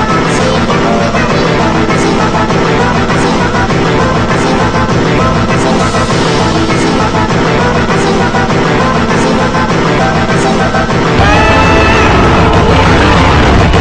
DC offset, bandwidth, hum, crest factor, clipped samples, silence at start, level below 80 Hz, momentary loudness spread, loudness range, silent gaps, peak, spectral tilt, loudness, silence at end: under 0.1%; 10 kHz; none; 8 dB; under 0.1%; 0 s; -20 dBFS; 4 LU; 3 LU; none; 0 dBFS; -5.5 dB/octave; -9 LUFS; 0 s